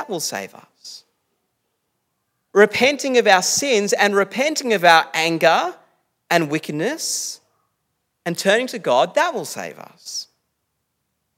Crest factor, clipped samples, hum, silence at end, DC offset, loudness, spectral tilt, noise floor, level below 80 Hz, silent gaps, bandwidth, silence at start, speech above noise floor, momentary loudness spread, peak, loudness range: 20 dB; under 0.1%; none; 1.15 s; under 0.1%; -18 LUFS; -2.5 dB/octave; -74 dBFS; -72 dBFS; none; 16.5 kHz; 0 s; 56 dB; 17 LU; 0 dBFS; 6 LU